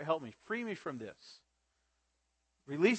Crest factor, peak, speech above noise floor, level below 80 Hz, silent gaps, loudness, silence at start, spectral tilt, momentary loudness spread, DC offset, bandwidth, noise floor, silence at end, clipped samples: 22 dB; -16 dBFS; 45 dB; -82 dBFS; none; -39 LUFS; 0 s; -5.5 dB/octave; 18 LU; under 0.1%; 8.4 kHz; -81 dBFS; 0 s; under 0.1%